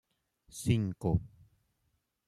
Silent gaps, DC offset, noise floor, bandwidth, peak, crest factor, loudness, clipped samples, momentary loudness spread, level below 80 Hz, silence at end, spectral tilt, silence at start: none; under 0.1%; -79 dBFS; 14 kHz; -14 dBFS; 22 dB; -33 LUFS; under 0.1%; 8 LU; -52 dBFS; 1 s; -6.5 dB/octave; 0.55 s